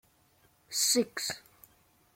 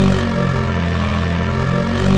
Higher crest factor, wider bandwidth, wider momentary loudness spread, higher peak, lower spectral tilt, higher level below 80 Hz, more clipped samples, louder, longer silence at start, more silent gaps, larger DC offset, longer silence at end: first, 20 dB vs 12 dB; first, 16.5 kHz vs 9.8 kHz; first, 11 LU vs 2 LU; second, -16 dBFS vs -2 dBFS; second, -1 dB/octave vs -7 dB/octave; second, -74 dBFS vs -28 dBFS; neither; second, -29 LUFS vs -18 LUFS; first, 0.7 s vs 0 s; neither; neither; first, 0.75 s vs 0 s